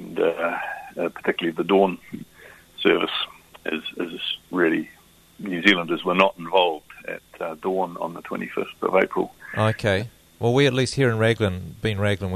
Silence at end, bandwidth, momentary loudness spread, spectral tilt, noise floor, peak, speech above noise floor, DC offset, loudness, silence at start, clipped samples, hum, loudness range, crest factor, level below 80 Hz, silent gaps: 0 s; 13.5 kHz; 14 LU; -5.5 dB/octave; -48 dBFS; -2 dBFS; 27 dB; under 0.1%; -23 LUFS; 0 s; under 0.1%; none; 3 LU; 22 dB; -56 dBFS; none